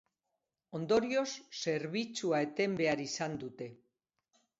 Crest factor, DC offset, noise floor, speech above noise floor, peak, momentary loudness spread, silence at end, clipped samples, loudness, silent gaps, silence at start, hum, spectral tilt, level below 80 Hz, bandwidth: 18 dB; under 0.1%; -87 dBFS; 53 dB; -18 dBFS; 13 LU; 0.85 s; under 0.1%; -34 LUFS; none; 0.7 s; none; -4 dB/octave; -74 dBFS; 7.6 kHz